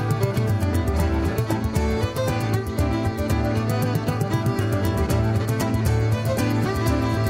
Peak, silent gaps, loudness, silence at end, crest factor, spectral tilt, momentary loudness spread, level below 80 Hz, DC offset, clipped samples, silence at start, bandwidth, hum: -10 dBFS; none; -23 LUFS; 0 s; 12 dB; -6.5 dB/octave; 2 LU; -32 dBFS; under 0.1%; under 0.1%; 0 s; 16.5 kHz; none